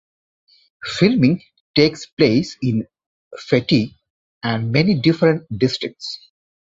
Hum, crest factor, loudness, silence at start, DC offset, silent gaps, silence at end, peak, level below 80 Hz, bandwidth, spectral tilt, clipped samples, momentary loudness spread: none; 18 dB; -18 LUFS; 0.85 s; under 0.1%; 1.60-1.74 s, 2.13-2.17 s, 3.06-3.31 s, 4.10-4.41 s; 0.5 s; -2 dBFS; -52 dBFS; 7.8 kHz; -6.5 dB/octave; under 0.1%; 15 LU